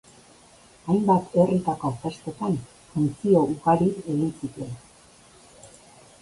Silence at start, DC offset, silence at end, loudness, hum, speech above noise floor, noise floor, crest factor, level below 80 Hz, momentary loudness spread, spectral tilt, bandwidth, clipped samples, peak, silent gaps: 0.85 s; under 0.1%; 0.55 s; -24 LUFS; none; 30 dB; -53 dBFS; 20 dB; -58 dBFS; 14 LU; -8 dB/octave; 11.5 kHz; under 0.1%; -6 dBFS; none